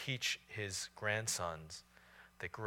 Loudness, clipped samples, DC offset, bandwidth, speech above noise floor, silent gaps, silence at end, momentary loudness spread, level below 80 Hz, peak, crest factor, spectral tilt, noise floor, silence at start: -40 LUFS; under 0.1%; under 0.1%; 17.5 kHz; 21 dB; none; 0 s; 16 LU; -70 dBFS; -22 dBFS; 20 dB; -2 dB/octave; -63 dBFS; 0 s